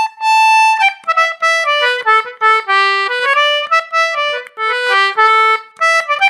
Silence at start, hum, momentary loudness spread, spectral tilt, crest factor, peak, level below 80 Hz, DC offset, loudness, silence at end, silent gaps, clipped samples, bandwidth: 0 s; none; 5 LU; 2 dB/octave; 12 dB; 0 dBFS; -82 dBFS; under 0.1%; -12 LUFS; 0 s; none; under 0.1%; 15.5 kHz